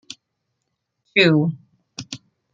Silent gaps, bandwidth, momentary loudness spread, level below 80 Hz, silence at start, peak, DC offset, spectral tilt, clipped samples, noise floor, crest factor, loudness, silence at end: none; 7.8 kHz; 25 LU; -68 dBFS; 1.15 s; -2 dBFS; under 0.1%; -5.5 dB/octave; under 0.1%; -76 dBFS; 20 dB; -18 LUFS; 0.35 s